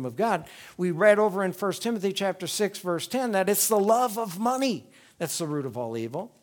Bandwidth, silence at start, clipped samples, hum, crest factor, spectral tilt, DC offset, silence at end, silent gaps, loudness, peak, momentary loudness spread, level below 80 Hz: over 20 kHz; 0 s; under 0.1%; none; 20 dB; -4 dB/octave; under 0.1%; 0.15 s; none; -26 LUFS; -6 dBFS; 11 LU; -74 dBFS